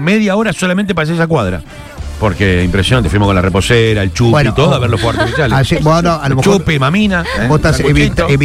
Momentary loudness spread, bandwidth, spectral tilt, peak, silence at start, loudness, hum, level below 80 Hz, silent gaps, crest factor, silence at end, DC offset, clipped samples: 4 LU; 15 kHz; -6 dB/octave; 0 dBFS; 0 s; -11 LUFS; none; -26 dBFS; none; 10 dB; 0 s; under 0.1%; under 0.1%